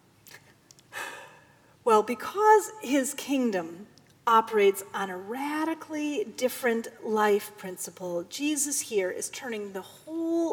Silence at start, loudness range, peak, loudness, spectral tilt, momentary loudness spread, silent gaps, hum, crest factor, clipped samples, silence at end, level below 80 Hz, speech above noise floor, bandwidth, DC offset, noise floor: 0.3 s; 4 LU; -8 dBFS; -28 LUFS; -3 dB/octave; 15 LU; none; none; 20 dB; under 0.1%; 0 s; -78 dBFS; 30 dB; over 20 kHz; under 0.1%; -58 dBFS